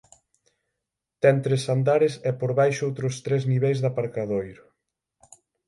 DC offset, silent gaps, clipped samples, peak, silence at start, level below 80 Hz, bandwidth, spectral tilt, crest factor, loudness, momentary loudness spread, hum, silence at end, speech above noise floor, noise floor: under 0.1%; none; under 0.1%; -6 dBFS; 1.25 s; -64 dBFS; 11.5 kHz; -6.5 dB/octave; 18 dB; -24 LUFS; 8 LU; none; 1.15 s; 61 dB; -84 dBFS